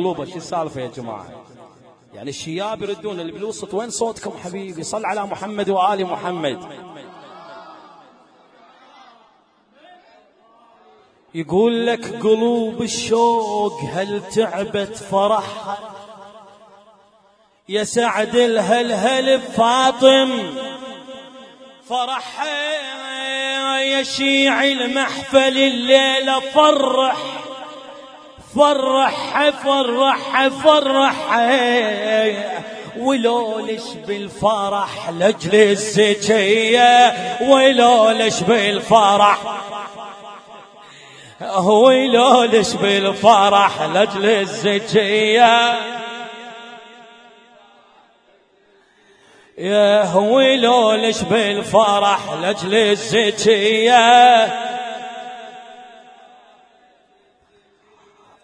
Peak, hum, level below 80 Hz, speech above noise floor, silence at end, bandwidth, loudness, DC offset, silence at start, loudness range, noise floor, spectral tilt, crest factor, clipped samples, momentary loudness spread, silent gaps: 0 dBFS; none; -60 dBFS; 41 dB; 2.55 s; 10.5 kHz; -16 LUFS; under 0.1%; 0 s; 12 LU; -57 dBFS; -3.5 dB/octave; 18 dB; under 0.1%; 18 LU; none